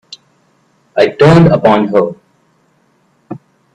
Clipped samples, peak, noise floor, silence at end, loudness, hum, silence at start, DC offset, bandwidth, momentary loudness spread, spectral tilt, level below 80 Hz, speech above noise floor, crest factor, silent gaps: under 0.1%; 0 dBFS; -55 dBFS; 0.35 s; -9 LUFS; none; 0.95 s; under 0.1%; 9.2 kHz; 24 LU; -8 dB/octave; -46 dBFS; 47 dB; 12 dB; none